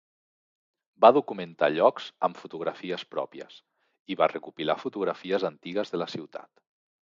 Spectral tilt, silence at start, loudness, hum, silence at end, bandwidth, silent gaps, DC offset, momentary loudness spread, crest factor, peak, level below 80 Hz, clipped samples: -6 dB/octave; 1 s; -27 LUFS; none; 0.75 s; 7.4 kHz; 3.99-4.05 s; under 0.1%; 18 LU; 24 dB; -4 dBFS; -78 dBFS; under 0.1%